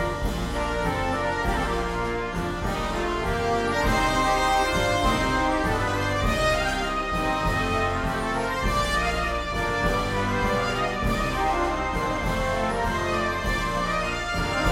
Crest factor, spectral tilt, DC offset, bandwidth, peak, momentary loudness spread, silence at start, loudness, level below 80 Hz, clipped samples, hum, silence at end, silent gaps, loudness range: 14 dB; -4.5 dB/octave; under 0.1%; 16.5 kHz; -10 dBFS; 5 LU; 0 s; -25 LUFS; -34 dBFS; under 0.1%; none; 0 s; none; 3 LU